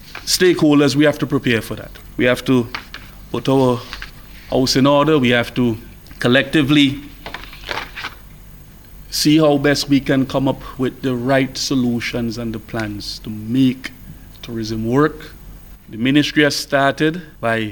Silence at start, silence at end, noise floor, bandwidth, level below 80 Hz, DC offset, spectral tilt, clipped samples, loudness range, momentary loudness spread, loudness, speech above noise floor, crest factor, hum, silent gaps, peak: 0 s; 0 s; -40 dBFS; over 20 kHz; -40 dBFS; under 0.1%; -5 dB/octave; under 0.1%; 5 LU; 18 LU; -17 LUFS; 23 dB; 18 dB; none; none; 0 dBFS